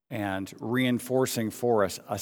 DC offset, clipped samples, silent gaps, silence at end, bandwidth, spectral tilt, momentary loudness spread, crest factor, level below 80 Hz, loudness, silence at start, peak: under 0.1%; under 0.1%; none; 0 s; 20 kHz; -5 dB/octave; 7 LU; 16 dB; -68 dBFS; -28 LUFS; 0.1 s; -10 dBFS